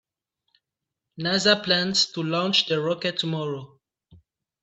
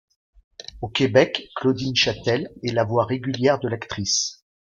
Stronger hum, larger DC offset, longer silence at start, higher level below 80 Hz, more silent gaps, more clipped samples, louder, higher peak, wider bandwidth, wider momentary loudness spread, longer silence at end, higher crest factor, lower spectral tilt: neither; neither; first, 1.15 s vs 0.6 s; second, -68 dBFS vs -54 dBFS; neither; neither; about the same, -23 LUFS vs -22 LUFS; about the same, -4 dBFS vs -4 dBFS; about the same, 8.4 kHz vs 7.8 kHz; about the same, 10 LU vs 9 LU; about the same, 0.5 s vs 0.4 s; about the same, 22 dB vs 20 dB; about the same, -3.5 dB/octave vs -4 dB/octave